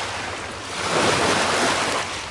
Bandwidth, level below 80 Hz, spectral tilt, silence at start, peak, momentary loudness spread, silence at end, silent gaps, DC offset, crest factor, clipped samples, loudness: 11.5 kHz; -50 dBFS; -2.5 dB/octave; 0 s; -6 dBFS; 11 LU; 0 s; none; under 0.1%; 16 dB; under 0.1%; -21 LUFS